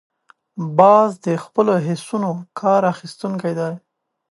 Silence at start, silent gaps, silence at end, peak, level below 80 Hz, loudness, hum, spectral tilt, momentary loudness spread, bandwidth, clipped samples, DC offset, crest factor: 0.55 s; none; 0.55 s; 0 dBFS; -70 dBFS; -18 LUFS; none; -7 dB/octave; 15 LU; 11.5 kHz; under 0.1%; under 0.1%; 18 dB